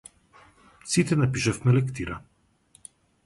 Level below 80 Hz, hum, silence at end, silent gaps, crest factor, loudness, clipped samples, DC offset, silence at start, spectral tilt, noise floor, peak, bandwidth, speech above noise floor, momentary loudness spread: -52 dBFS; none; 1.05 s; none; 18 dB; -25 LUFS; under 0.1%; under 0.1%; 0.85 s; -5.5 dB/octave; -61 dBFS; -8 dBFS; 11.5 kHz; 38 dB; 15 LU